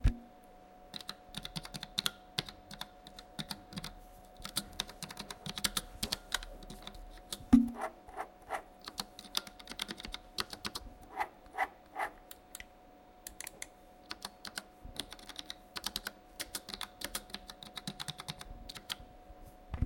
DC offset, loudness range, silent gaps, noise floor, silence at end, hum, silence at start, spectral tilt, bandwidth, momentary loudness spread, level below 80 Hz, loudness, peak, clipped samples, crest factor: under 0.1%; 9 LU; none; -59 dBFS; 0 s; none; 0 s; -3.5 dB/octave; 17 kHz; 14 LU; -50 dBFS; -40 LUFS; -10 dBFS; under 0.1%; 30 dB